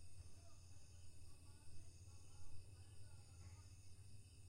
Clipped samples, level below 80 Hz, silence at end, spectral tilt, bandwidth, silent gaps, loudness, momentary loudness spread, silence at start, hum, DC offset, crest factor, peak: under 0.1%; -66 dBFS; 0 s; -4 dB/octave; 15.5 kHz; none; -64 LUFS; 3 LU; 0 s; none; under 0.1%; 14 dB; -40 dBFS